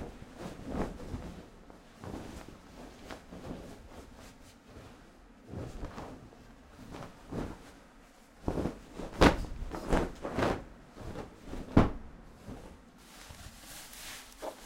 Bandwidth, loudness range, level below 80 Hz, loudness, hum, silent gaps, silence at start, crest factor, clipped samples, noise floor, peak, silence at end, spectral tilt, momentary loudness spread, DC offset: 16 kHz; 16 LU; -44 dBFS; -36 LUFS; none; none; 0 s; 30 dB; under 0.1%; -57 dBFS; -6 dBFS; 0 s; -6 dB/octave; 24 LU; under 0.1%